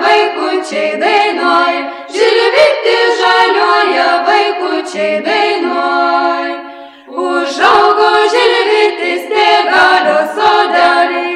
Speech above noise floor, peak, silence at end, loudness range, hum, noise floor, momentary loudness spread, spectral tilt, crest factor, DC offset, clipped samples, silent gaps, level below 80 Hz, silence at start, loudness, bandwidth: 19 dB; 0 dBFS; 0 s; 3 LU; none; -31 dBFS; 8 LU; -2 dB/octave; 10 dB; under 0.1%; 0.2%; none; -58 dBFS; 0 s; -10 LUFS; 13.5 kHz